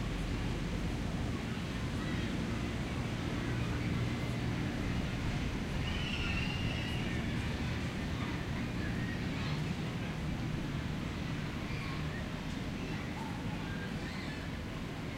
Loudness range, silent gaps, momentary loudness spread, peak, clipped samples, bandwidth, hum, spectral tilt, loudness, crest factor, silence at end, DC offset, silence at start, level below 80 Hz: 3 LU; none; 4 LU; -22 dBFS; under 0.1%; 16 kHz; none; -6 dB/octave; -37 LUFS; 14 dB; 0 s; under 0.1%; 0 s; -44 dBFS